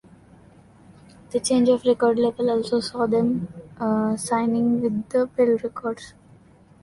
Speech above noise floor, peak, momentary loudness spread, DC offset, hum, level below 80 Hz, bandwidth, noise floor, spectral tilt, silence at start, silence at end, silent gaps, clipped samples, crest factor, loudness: 30 dB; -8 dBFS; 10 LU; under 0.1%; none; -58 dBFS; 11.5 kHz; -52 dBFS; -5.5 dB/octave; 1.3 s; 0.75 s; none; under 0.1%; 16 dB; -22 LUFS